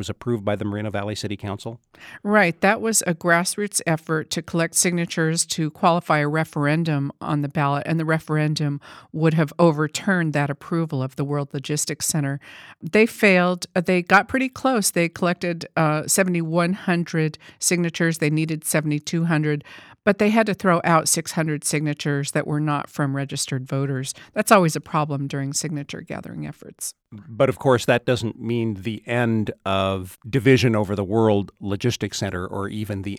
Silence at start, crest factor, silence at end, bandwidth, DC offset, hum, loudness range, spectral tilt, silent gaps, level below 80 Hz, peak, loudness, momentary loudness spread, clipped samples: 0 s; 20 dB; 0 s; 17.5 kHz; under 0.1%; none; 4 LU; -4.5 dB/octave; none; -58 dBFS; 0 dBFS; -22 LUFS; 11 LU; under 0.1%